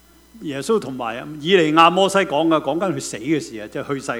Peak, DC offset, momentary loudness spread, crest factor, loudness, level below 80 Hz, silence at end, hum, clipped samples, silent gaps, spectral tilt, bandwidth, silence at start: 0 dBFS; under 0.1%; 15 LU; 20 dB; -19 LUFS; -56 dBFS; 0 s; none; under 0.1%; none; -4.5 dB/octave; 16 kHz; 0.35 s